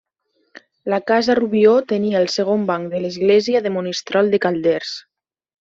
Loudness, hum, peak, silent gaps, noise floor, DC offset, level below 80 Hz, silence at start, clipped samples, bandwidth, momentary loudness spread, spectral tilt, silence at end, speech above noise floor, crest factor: -18 LUFS; none; -2 dBFS; none; -67 dBFS; under 0.1%; -62 dBFS; 0.85 s; under 0.1%; 7.8 kHz; 9 LU; -5.5 dB/octave; 0.6 s; 50 dB; 16 dB